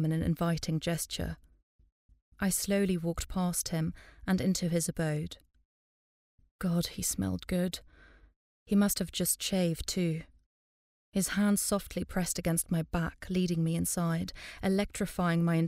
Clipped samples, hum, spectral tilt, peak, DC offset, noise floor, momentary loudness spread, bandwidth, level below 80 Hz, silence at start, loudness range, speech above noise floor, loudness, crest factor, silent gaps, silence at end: under 0.1%; none; -5 dB/octave; -16 dBFS; under 0.1%; under -90 dBFS; 8 LU; 16 kHz; -50 dBFS; 0 s; 3 LU; over 59 dB; -31 LUFS; 16 dB; 1.63-1.79 s, 1.92-2.09 s, 2.22-2.32 s, 5.65-6.38 s, 6.51-6.59 s, 8.36-8.66 s, 10.46-11.12 s; 0 s